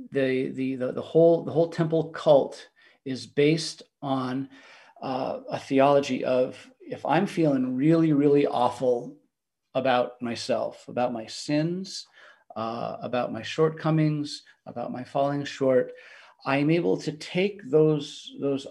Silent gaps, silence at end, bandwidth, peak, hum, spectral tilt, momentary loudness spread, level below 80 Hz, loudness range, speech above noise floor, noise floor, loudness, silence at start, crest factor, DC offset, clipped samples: none; 0 s; 11.5 kHz; -6 dBFS; none; -6.5 dB/octave; 15 LU; -74 dBFS; 5 LU; 51 dB; -76 dBFS; -26 LUFS; 0 s; 18 dB; under 0.1%; under 0.1%